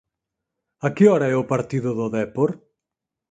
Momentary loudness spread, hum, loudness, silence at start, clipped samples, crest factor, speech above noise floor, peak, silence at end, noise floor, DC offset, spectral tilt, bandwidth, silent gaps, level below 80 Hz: 11 LU; none; -21 LUFS; 0.85 s; under 0.1%; 18 dB; 66 dB; -4 dBFS; 0.75 s; -85 dBFS; under 0.1%; -8 dB/octave; 9.2 kHz; none; -62 dBFS